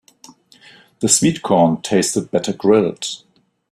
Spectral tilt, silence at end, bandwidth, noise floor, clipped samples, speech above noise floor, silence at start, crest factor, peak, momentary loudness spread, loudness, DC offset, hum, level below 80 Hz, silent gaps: -4 dB/octave; 0.55 s; 13.5 kHz; -47 dBFS; under 0.1%; 31 dB; 1 s; 18 dB; 0 dBFS; 11 LU; -17 LUFS; under 0.1%; none; -56 dBFS; none